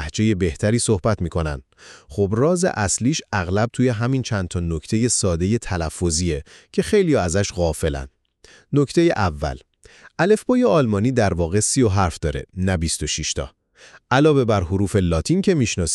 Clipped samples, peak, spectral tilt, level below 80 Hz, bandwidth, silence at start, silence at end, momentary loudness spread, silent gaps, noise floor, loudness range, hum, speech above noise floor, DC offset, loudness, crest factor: under 0.1%; -4 dBFS; -5 dB/octave; -36 dBFS; 12.5 kHz; 0 s; 0 s; 9 LU; none; -51 dBFS; 2 LU; none; 32 dB; under 0.1%; -20 LUFS; 16 dB